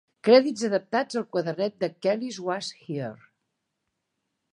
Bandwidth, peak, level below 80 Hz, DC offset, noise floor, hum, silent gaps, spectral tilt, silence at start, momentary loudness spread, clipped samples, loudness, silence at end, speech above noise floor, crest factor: 11 kHz; -6 dBFS; -80 dBFS; under 0.1%; -80 dBFS; none; none; -5 dB/octave; 0.25 s; 15 LU; under 0.1%; -26 LUFS; 1.35 s; 55 dB; 22 dB